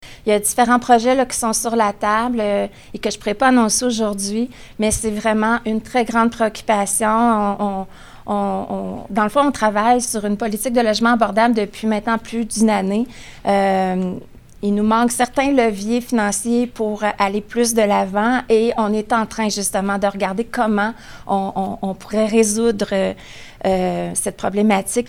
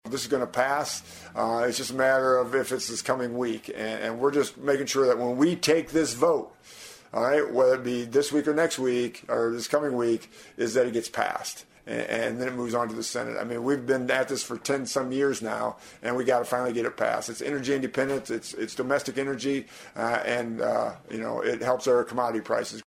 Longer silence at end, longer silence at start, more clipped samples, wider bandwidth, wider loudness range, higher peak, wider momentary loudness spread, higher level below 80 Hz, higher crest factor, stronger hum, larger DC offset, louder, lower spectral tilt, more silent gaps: about the same, 0 s vs 0.05 s; about the same, 0 s vs 0.05 s; neither; about the same, 16.5 kHz vs 16 kHz; about the same, 2 LU vs 4 LU; first, 0 dBFS vs -8 dBFS; about the same, 9 LU vs 9 LU; first, -44 dBFS vs -66 dBFS; about the same, 18 dB vs 20 dB; neither; neither; first, -18 LUFS vs -27 LUFS; about the same, -4 dB/octave vs -4 dB/octave; neither